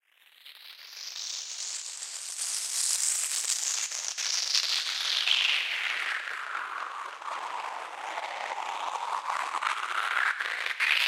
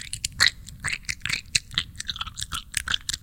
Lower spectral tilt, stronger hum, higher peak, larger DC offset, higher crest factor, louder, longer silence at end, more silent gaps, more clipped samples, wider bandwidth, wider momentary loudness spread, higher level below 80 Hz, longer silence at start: second, 5.5 dB/octave vs 0 dB/octave; neither; second, -8 dBFS vs -2 dBFS; neither; about the same, 24 dB vs 28 dB; second, -29 LUFS vs -26 LUFS; about the same, 0 s vs 0.05 s; neither; neither; about the same, 16.5 kHz vs 17 kHz; about the same, 12 LU vs 11 LU; second, under -90 dBFS vs -44 dBFS; first, 0.4 s vs 0 s